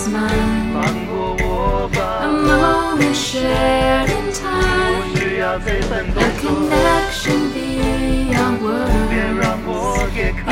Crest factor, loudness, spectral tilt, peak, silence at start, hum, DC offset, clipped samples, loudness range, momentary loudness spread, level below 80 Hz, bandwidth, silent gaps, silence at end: 16 dB; -17 LUFS; -5 dB/octave; -2 dBFS; 0 s; none; under 0.1%; under 0.1%; 2 LU; 5 LU; -26 dBFS; 16.5 kHz; none; 0 s